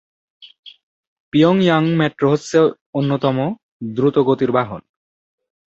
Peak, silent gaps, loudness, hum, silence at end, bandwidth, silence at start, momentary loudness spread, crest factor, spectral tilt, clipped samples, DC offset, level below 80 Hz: -2 dBFS; 0.83-1.32 s, 2.81-2.93 s, 3.63-3.80 s; -17 LUFS; none; 0.85 s; 8 kHz; 0.65 s; 11 LU; 16 dB; -7 dB/octave; under 0.1%; under 0.1%; -58 dBFS